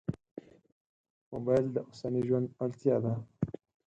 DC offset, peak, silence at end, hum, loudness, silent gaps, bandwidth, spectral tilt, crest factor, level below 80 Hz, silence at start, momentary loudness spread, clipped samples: under 0.1%; -14 dBFS; 0.35 s; none; -33 LUFS; 0.31-0.37 s, 0.72-1.04 s, 1.10-1.31 s; 8.4 kHz; -9.5 dB/octave; 20 dB; -64 dBFS; 0.1 s; 16 LU; under 0.1%